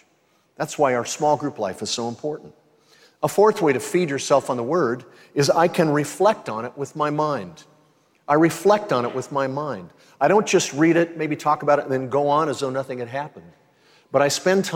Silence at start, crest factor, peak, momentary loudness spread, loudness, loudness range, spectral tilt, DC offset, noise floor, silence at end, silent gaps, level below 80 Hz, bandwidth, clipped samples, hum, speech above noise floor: 0.6 s; 18 dB; -4 dBFS; 12 LU; -21 LUFS; 3 LU; -5 dB/octave; under 0.1%; -63 dBFS; 0 s; none; -70 dBFS; 16.5 kHz; under 0.1%; none; 42 dB